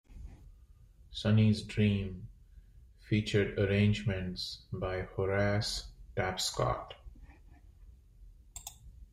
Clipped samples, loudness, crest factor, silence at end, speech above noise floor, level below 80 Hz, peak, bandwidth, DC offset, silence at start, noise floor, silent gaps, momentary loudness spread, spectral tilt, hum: under 0.1%; -32 LUFS; 18 dB; 0.1 s; 27 dB; -50 dBFS; -16 dBFS; 15 kHz; under 0.1%; 0.1 s; -58 dBFS; none; 21 LU; -5.5 dB/octave; none